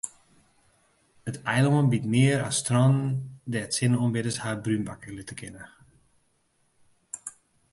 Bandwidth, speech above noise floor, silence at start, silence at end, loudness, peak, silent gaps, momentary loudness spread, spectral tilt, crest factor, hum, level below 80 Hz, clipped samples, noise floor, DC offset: 11.5 kHz; 44 dB; 0.05 s; 0.45 s; -25 LUFS; -10 dBFS; none; 18 LU; -5.5 dB/octave; 18 dB; none; -62 dBFS; under 0.1%; -69 dBFS; under 0.1%